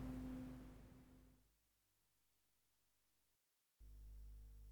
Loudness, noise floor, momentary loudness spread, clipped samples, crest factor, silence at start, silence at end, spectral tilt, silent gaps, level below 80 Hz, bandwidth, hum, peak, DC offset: -58 LUFS; -85 dBFS; 16 LU; under 0.1%; 20 dB; 0 s; 0 s; -7 dB/octave; none; -64 dBFS; over 20 kHz; none; -38 dBFS; under 0.1%